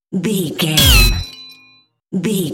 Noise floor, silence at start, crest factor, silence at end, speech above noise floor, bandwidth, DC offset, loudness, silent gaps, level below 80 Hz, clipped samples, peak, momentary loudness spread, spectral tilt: -51 dBFS; 0.1 s; 16 dB; 0 s; 38 dB; 17 kHz; under 0.1%; -14 LUFS; none; -22 dBFS; under 0.1%; 0 dBFS; 18 LU; -3.5 dB/octave